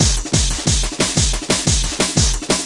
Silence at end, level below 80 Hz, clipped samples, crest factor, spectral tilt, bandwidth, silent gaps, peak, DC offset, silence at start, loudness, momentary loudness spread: 0 s; -22 dBFS; under 0.1%; 16 dB; -3 dB/octave; 11.5 kHz; none; 0 dBFS; under 0.1%; 0 s; -16 LUFS; 2 LU